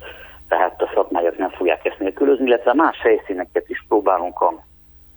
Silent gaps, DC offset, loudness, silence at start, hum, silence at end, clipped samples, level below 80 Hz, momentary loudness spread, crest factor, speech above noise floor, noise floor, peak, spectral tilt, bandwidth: none; under 0.1%; -19 LUFS; 0 s; none; 0.6 s; under 0.1%; -52 dBFS; 8 LU; 18 dB; 20 dB; -39 dBFS; -2 dBFS; -7 dB/octave; over 20 kHz